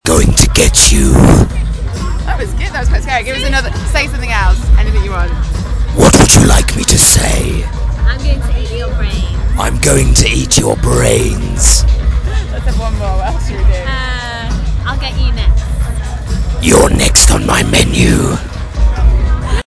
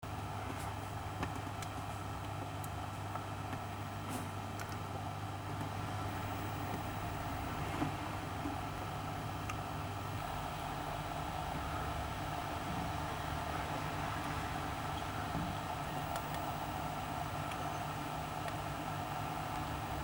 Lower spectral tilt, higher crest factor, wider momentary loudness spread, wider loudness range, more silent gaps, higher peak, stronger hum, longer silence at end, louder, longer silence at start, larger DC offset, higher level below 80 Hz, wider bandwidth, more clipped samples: about the same, -4 dB/octave vs -5 dB/octave; second, 10 dB vs 18 dB; first, 12 LU vs 3 LU; first, 7 LU vs 3 LU; neither; first, 0 dBFS vs -22 dBFS; neither; first, 0.15 s vs 0 s; first, -11 LUFS vs -41 LUFS; about the same, 0.05 s vs 0 s; neither; first, -14 dBFS vs -54 dBFS; second, 11 kHz vs over 20 kHz; first, 0.3% vs under 0.1%